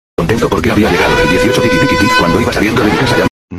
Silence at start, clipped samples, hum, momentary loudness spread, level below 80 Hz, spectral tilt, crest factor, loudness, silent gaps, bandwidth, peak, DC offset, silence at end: 0.2 s; under 0.1%; none; 3 LU; -28 dBFS; -5 dB/octave; 10 dB; -10 LUFS; 3.30-3.48 s; 14 kHz; 0 dBFS; under 0.1%; 0 s